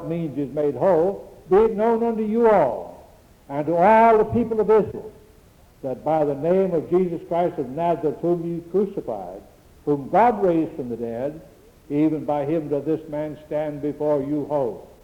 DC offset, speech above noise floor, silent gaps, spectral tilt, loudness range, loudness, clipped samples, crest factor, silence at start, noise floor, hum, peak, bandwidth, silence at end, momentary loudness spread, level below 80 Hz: under 0.1%; 30 dB; none; -9 dB/octave; 6 LU; -22 LUFS; under 0.1%; 16 dB; 0 s; -51 dBFS; none; -4 dBFS; 11 kHz; 0.2 s; 13 LU; -52 dBFS